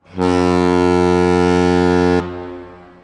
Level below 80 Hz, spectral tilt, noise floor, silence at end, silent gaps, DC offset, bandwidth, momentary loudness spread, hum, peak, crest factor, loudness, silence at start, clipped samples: -40 dBFS; -7 dB/octave; -36 dBFS; 0.3 s; none; under 0.1%; 11 kHz; 15 LU; none; -6 dBFS; 10 dB; -14 LUFS; 0.15 s; under 0.1%